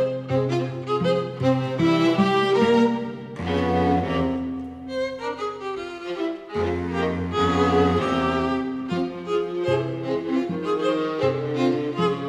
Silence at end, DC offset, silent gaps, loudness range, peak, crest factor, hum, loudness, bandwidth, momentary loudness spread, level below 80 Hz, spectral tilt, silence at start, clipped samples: 0 s; under 0.1%; none; 5 LU; -8 dBFS; 16 dB; none; -23 LUFS; 11.5 kHz; 10 LU; -48 dBFS; -7 dB/octave; 0 s; under 0.1%